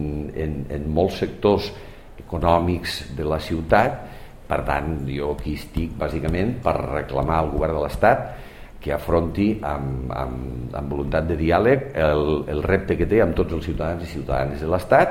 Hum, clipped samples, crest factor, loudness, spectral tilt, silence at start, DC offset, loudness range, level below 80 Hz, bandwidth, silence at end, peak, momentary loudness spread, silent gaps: none; under 0.1%; 22 dB; -23 LUFS; -7.5 dB/octave; 0 s; under 0.1%; 3 LU; -34 dBFS; 16 kHz; 0 s; 0 dBFS; 10 LU; none